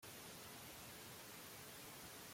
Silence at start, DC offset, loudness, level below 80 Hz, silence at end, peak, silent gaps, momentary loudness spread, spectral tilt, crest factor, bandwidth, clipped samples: 0 s; under 0.1%; -54 LUFS; -78 dBFS; 0 s; -44 dBFS; none; 0 LU; -2.5 dB/octave; 12 dB; 16.5 kHz; under 0.1%